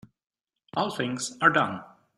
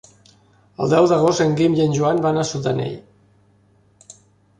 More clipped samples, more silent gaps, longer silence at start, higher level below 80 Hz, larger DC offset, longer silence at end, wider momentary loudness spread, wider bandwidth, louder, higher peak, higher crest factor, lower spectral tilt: neither; neither; about the same, 0.75 s vs 0.8 s; second, -70 dBFS vs -56 dBFS; neither; second, 0.3 s vs 1.6 s; about the same, 12 LU vs 10 LU; first, 15 kHz vs 10.5 kHz; second, -26 LUFS vs -18 LUFS; about the same, -4 dBFS vs -2 dBFS; first, 24 dB vs 18 dB; second, -3.5 dB/octave vs -6 dB/octave